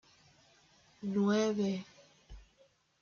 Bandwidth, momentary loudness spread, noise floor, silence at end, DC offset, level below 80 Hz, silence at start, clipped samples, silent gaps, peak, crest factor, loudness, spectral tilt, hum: 7 kHz; 14 LU; -69 dBFS; 0.6 s; under 0.1%; -64 dBFS; 1 s; under 0.1%; none; -18 dBFS; 18 dB; -33 LUFS; -6 dB/octave; none